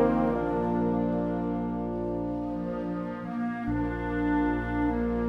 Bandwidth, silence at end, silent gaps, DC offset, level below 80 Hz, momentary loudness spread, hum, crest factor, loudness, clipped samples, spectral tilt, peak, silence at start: 5.6 kHz; 0 s; none; under 0.1%; -42 dBFS; 6 LU; 60 Hz at -60 dBFS; 18 dB; -29 LUFS; under 0.1%; -9.5 dB/octave; -12 dBFS; 0 s